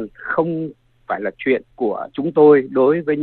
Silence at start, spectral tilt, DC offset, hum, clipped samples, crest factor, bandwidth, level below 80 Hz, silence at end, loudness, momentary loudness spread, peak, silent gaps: 0 s; -10.5 dB/octave; under 0.1%; none; under 0.1%; 18 dB; 4.3 kHz; -58 dBFS; 0 s; -18 LUFS; 13 LU; 0 dBFS; none